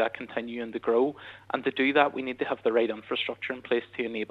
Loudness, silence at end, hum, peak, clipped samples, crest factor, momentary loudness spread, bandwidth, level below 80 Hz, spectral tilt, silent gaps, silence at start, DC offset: -28 LUFS; 0.05 s; none; -6 dBFS; under 0.1%; 22 dB; 10 LU; 5.4 kHz; -72 dBFS; -6.5 dB/octave; none; 0 s; under 0.1%